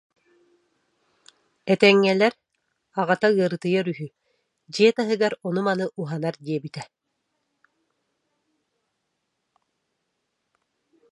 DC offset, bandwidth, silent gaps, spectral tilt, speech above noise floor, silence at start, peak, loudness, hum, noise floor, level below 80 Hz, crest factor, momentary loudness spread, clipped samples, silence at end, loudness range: under 0.1%; 11 kHz; none; -6 dB/octave; 56 dB; 1.65 s; -2 dBFS; -22 LUFS; none; -77 dBFS; -76 dBFS; 24 dB; 18 LU; under 0.1%; 4.3 s; 12 LU